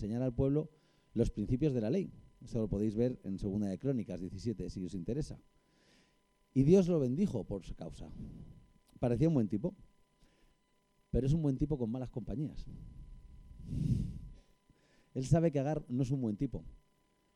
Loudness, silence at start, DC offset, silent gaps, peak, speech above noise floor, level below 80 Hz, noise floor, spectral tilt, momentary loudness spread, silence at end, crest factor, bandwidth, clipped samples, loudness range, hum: -35 LUFS; 0 s; under 0.1%; none; -14 dBFS; 40 dB; -50 dBFS; -73 dBFS; -9 dB/octave; 18 LU; 0.6 s; 20 dB; 11 kHz; under 0.1%; 5 LU; none